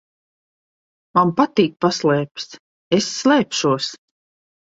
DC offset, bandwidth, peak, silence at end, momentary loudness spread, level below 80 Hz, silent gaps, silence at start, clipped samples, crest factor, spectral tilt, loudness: under 0.1%; 8 kHz; -2 dBFS; 0.75 s; 11 LU; -62 dBFS; 2.60-2.91 s; 1.15 s; under 0.1%; 18 dB; -4.5 dB/octave; -19 LUFS